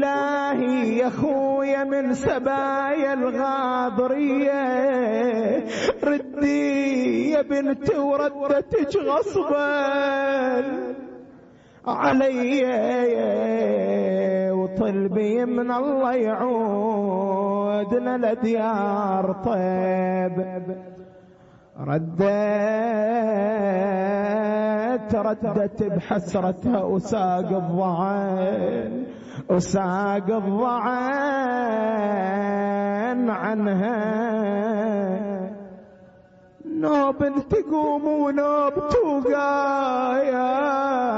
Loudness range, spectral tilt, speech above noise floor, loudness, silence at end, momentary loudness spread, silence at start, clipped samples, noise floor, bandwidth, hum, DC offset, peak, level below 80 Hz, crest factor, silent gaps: 3 LU; -7 dB/octave; 29 dB; -23 LUFS; 0 s; 4 LU; 0 s; under 0.1%; -51 dBFS; 8 kHz; none; under 0.1%; -8 dBFS; -56 dBFS; 14 dB; none